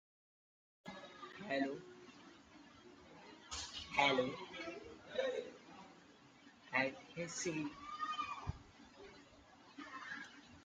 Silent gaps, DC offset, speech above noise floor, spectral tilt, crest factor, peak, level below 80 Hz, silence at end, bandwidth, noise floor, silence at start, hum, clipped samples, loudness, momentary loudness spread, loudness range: none; under 0.1%; 25 dB; -3.5 dB/octave; 26 dB; -20 dBFS; -68 dBFS; 0 s; 9.6 kHz; -64 dBFS; 0.85 s; none; under 0.1%; -42 LUFS; 23 LU; 7 LU